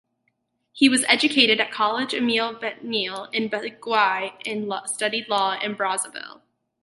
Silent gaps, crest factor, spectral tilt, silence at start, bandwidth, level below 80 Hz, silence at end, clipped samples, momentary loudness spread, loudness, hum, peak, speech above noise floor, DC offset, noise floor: none; 24 dB; -2 dB/octave; 0.75 s; 12 kHz; -76 dBFS; 0.55 s; under 0.1%; 12 LU; -22 LUFS; none; 0 dBFS; 50 dB; under 0.1%; -73 dBFS